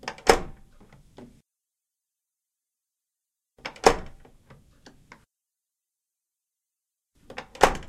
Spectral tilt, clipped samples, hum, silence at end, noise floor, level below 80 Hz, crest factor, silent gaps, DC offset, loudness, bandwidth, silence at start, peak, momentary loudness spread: -3 dB/octave; under 0.1%; none; 0 s; -87 dBFS; -44 dBFS; 30 dB; none; under 0.1%; -23 LUFS; 16 kHz; 0.05 s; 0 dBFS; 21 LU